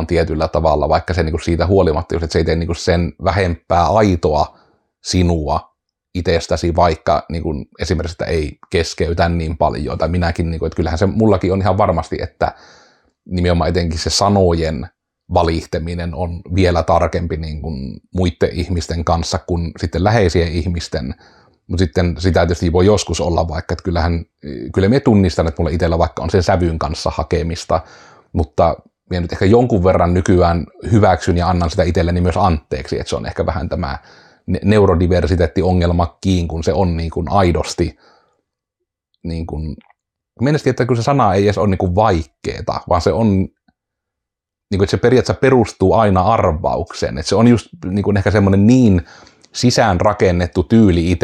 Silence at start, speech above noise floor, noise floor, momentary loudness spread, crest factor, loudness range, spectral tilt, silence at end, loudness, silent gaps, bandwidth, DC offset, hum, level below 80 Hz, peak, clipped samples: 0 s; 67 dB; -83 dBFS; 10 LU; 14 dB; 4 LU; -6.5 dB/octave; 0.05 s; -16 LUFS; none; 10 kHz; under 0.1%; none; -34 dBFS; -2 dBFS; under 0.1%